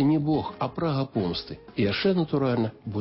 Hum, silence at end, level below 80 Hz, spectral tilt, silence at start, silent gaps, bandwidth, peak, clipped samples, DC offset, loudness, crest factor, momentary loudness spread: none; 0 s; -52 dBFS; -11 dB/octave; 0 s; none; 5.8 kHz; -12 dBFS; under 0.1%; under 0.1%; -27 LUFS; 14 dB; 7 LU